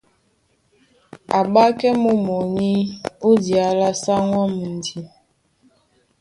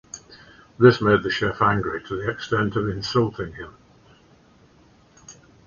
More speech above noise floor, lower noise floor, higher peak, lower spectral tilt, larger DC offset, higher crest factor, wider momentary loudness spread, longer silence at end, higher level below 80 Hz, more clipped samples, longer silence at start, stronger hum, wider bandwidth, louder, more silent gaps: first, 46 dB vs 34 dB; first, -63 dBFS vs -55 dBFS; about the same, -2 dBFS vs -2 dBFS; about the same, -6 dB/octave vs -6 dB/octave; neither; about the same, 18 dB vs 22 dB; second, 11 LU vs 21 LU; first, 1.15 s vs 0.35 s; second, -58 dBFS vs -50 dBFS; neither; first, 1.3 s vs 0.15 s; neither; first, 11.5 kHz vs 7.4 kHz; about the same, -19 LUFS vs -21 LUFS; neither